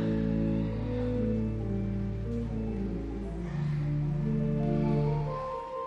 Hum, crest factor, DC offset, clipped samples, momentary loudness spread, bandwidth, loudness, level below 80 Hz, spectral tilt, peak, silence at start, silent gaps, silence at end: none; 14 dB; under 0.1%; under 0.1%; 7 LU; 6.4 kHz; -31 LUFS; -40 dBFS; -10 dB/octave; -16 dBFS; 0 s; none; 0 s